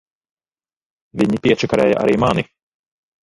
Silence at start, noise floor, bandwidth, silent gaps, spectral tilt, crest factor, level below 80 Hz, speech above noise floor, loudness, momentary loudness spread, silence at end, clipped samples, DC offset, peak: 1.15 s; under -90 dBFS; 11.5 kHz; none; -6.5 dB/octave; 18 dB; -48 dBFS; over 74 dB; -17 LUFS; 11 LU; 0.8 s; under 0.1%; under 0.1%; 0 dBFS